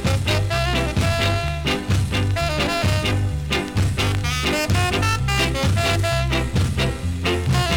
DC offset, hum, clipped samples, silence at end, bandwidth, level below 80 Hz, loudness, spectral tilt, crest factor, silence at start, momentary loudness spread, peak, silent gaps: under 0.1%; none; under 0.1%; 0 s; 18.5 kHz; -30 dBFS; -21 LUFS; -5 dB/octave; 14 dB; 0 s; 3 LU; -6 dBFS; none